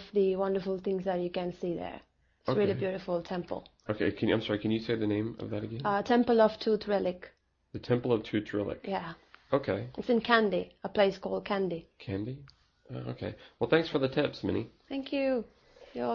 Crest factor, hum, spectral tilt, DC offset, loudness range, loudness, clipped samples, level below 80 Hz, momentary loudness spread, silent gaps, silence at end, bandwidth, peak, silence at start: 22 dB; none; -7.5 dB/octave; under 0.1%; 4 LU; -31 LUFS; under 0.1%; -62 dBFS; 15 LU; none; 0 s; 6.8 kHz; -10 dBFS; 0 s